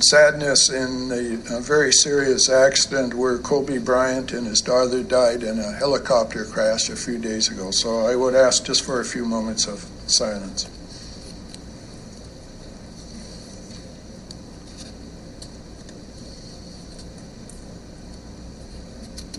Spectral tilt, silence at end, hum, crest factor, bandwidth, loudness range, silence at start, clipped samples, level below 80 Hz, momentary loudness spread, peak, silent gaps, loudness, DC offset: -2 dB/octave; 0 s; none; 20 dB; 12 kHz; 21 LU; 0 s; under 0.1%; -44 dBFS; 24 LU; -2 dBFS; none; -19 LUFS; under 0.1%